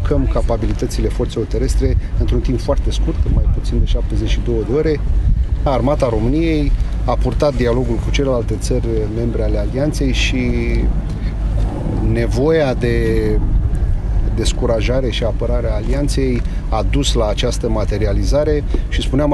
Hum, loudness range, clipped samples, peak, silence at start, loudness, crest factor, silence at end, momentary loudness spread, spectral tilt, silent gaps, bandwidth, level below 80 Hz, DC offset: none; 1 LU; under 0.1%; -2 dBFS; 0 s; -18 LUFS; 14 dB; 0 s; 4 LU; -6.5 dB/octave; none; 12 kHz; -18 dBFS; under 0.1%